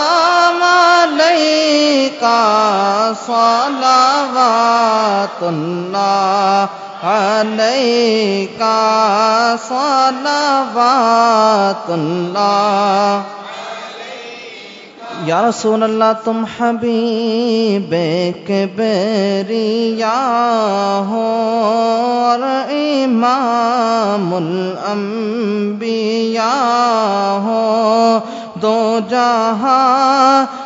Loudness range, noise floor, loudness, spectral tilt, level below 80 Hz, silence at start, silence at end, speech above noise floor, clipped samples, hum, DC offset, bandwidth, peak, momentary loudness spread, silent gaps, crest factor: 4 LU; -34 dBFS; -14 LUFS; -4.5 dB/octave; -66 dBFS; 0 s; 0 s; 20 dB; under 0.1%; none; under 0.1%; 7.8 kHz; 0 dBFS; 8 LU; none; 14 dB